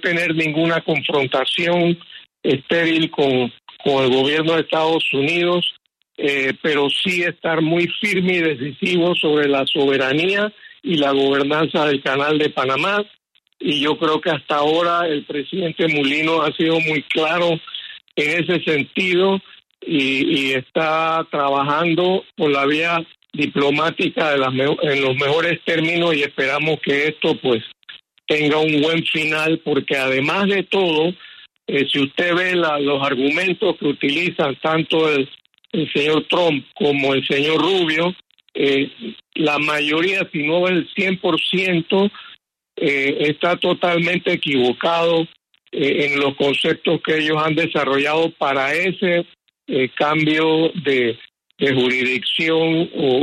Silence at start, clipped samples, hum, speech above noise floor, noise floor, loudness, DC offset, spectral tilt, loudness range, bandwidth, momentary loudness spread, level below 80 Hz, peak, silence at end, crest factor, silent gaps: 0.05 s; under 0.1%; none; 25 dB; -43 dBFS; -18 LUFS; under 0.1%; -5.5 dB/octave; 1 LU; 13 kHz; 5 LU; -64 dBFS; -6 dBFS; 0 s; 14 dB; none